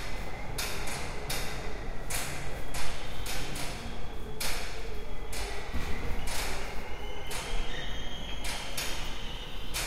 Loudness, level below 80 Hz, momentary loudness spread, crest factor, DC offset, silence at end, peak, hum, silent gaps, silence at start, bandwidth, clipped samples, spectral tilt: -37 LUFS; -38 dBFS; 6 LU; 14 dB; under 0.1%; 0 s; -14 dBFS; none; none; 0 s; 16 kHz; under 0.1%; -3 dB/octave